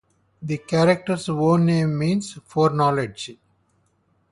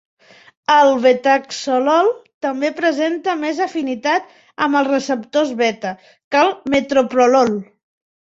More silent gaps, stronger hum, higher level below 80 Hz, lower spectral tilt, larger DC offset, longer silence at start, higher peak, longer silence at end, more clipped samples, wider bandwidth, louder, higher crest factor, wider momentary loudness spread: second, none vs 2.34-2.41 s, 6.24-6.31 s; neither; about the same, -58 dBFS vs -60 dBFS; first, -6.5 dB/octave vs -4 dB/octave; neither; second, 0.4 s vs 0.7 s; about the same, -4 dBFS vs -2 dBFS; first, 1 s vs 0.65 s; neither; first, 11.5 kHz vs 8 kHz; second, -21 LUFS vs -17 LUFS; about the same, 18 dB vs 16 dB; about the same, 12 LU vs 11 LU